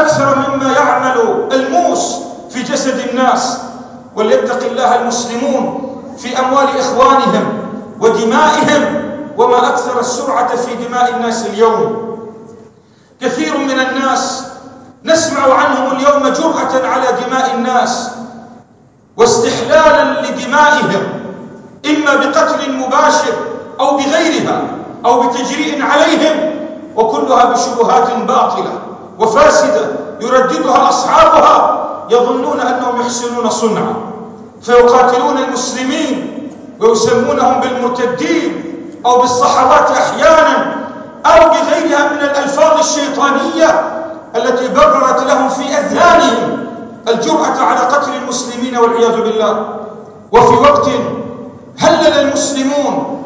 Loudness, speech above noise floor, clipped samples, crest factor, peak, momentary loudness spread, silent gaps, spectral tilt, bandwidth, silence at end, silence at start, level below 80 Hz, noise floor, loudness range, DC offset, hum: -11 LUFS; 34 dB; 0.4%; 12 dB; 0 dBFS; 14 LU; none; -3.5 dB/octave; 8 kHz; 0 s; 0 s; -46 dBFS; -45 dBFS; 4 LU; under 0.1%; none